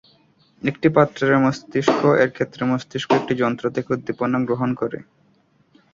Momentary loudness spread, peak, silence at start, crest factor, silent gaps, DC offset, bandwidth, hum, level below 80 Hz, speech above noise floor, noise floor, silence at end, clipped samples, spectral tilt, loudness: 9 LU; -2 dBFS; 0.65 s; 20 dB; none; under 0.1%; 7.6 kHz; none; -58 dBFS; 40 dB; -60 dBFS; 0.95 s; under 0.1%; -6.5 dB/octave; -20 LUFS